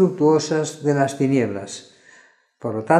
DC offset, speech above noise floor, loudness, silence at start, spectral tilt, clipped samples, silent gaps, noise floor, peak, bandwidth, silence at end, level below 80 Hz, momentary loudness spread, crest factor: under 0.1%; 34 dB; -21 LUFS; 0 s; -6 dB/octave; under 0.1%; none; -53 dBFS; -2 dBFS; 12.5 kHz; 0 s; -70 dBFS; 15 LU; 18 dB